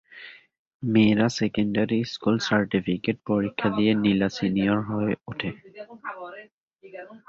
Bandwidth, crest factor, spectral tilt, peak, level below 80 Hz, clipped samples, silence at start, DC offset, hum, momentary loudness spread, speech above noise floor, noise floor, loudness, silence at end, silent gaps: 7.6 kHz; 18 dB; -6.5 dB/octave; -8 dBFS; -58 dBFS; under 0.1%; 0.1 s; under 0.1%; none; 21 LU; 22 dB; -46 dBFS; -24 LUFS; 0.1 s; 0.59-0.80 s, 6.52-6.68 s